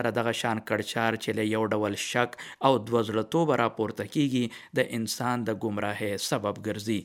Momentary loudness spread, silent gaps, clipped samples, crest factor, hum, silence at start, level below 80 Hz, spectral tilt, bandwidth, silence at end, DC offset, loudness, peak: 5 LU; none; under 0.1%; 22 dB; none; 0 s; -70 dBFS; -5 dB/octave; 17 kHz; 0 s; under 0.1%; -28 LUFS; -6 dBFS